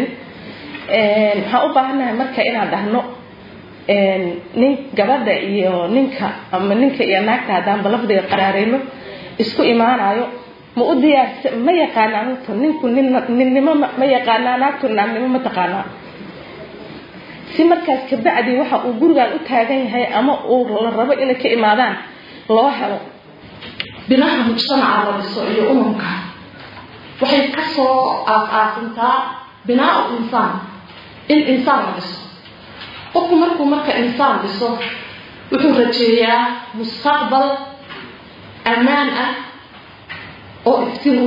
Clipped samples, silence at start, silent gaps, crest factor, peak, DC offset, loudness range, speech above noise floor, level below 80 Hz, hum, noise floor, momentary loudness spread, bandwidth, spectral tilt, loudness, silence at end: under 0.1%; 0 s; none; 16 dB; 0 dBFS; under 0.1%; 3 LU; 24 dB; -60 dBFS; none; -40 dBFS; 19 LU; 5.4 kHz; -7 dB/octave; -16 LUFS; 0 s